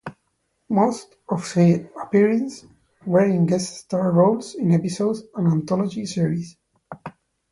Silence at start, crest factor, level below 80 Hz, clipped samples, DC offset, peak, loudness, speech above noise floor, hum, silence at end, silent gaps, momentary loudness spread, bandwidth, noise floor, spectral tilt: 0.05 s; 16 dB; -62 dBFS; under 0.1%; under 0.1%; -6 dBFS; -21 LUFS; 51 dB; none; 0.4 s; none; 20 LU; 11.5 kHz; -71 dBFS; -7 dB/octave